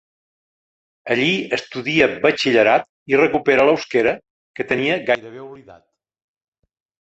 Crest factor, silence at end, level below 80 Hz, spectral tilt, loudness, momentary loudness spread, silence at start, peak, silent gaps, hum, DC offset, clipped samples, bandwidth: 18 dB; 1.25 s; -58 dBFS; -5 dB/octave; -18 LUFS; 15 LU; 1.05 s; -2 dBFS; 2.89-3.06 s, 4.30-4.54 s; none; under 0.1%; under 0.1%; 8.2 kHz